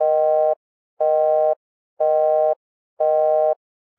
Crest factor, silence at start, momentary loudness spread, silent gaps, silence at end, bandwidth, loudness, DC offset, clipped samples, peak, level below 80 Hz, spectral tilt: 10 dB; 0 s; 10 LU; 0.56-0.97 s, 1.56-1.97 s, 2.56-2.97 s; 0.45 s; 3 kHz; -20 LUFS; under 0.1%; under 0.1%; -10 dBFS; under -90 dBFS; -6.5 dB/octave